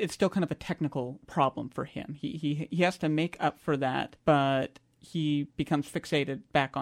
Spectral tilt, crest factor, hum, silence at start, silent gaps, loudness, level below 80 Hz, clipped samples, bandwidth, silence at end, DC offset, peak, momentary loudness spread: -6.5 dB/octave; 20 dB; none; 0 s; none; -30 LUFS; -62 dBFS; under 0.1%; 14.5 kHz; 0 s; under 0.1%; -10 dBFS; 10 LU